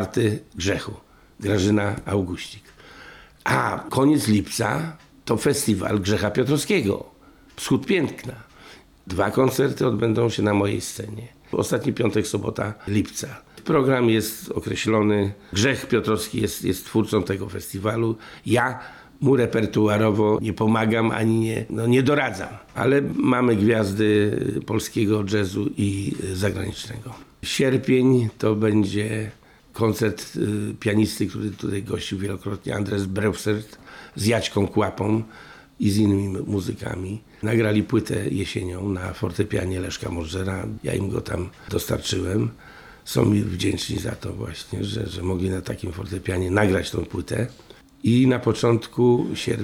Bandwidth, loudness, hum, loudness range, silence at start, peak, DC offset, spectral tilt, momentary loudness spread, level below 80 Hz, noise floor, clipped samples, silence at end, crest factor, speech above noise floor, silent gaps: 17 kHz; -23 LUFS; none; 5 LU; 0 s; -4 dBFS; under 0.1%; -6 dB/octave; 11 LU; -48 dBFS; -48 dBFS; under 0.1%; 0 s; 18 dB; 25 dB; none